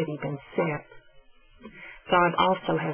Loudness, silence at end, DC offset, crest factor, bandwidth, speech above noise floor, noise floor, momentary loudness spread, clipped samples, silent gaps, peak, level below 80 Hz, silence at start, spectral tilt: -26 LUFS; 0 s; under 0.1%; 18 dB; 3.4 kHz; 29 dB; -55 dBFS; 21 LU; under 0.1%; none; -10 dBFS; -58 dBFS; 0 s; -9.5 dB/octave